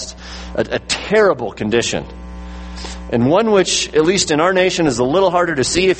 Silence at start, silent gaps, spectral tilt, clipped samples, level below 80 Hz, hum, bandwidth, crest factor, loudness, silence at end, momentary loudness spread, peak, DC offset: 0 s; none; -4 dB/octave; under 0.1%; -36 dBFS; none; 8.8 kHz; 16 dB; -15 LUFS; 0 s; 17 LU; 0 dBFS; under 0.1%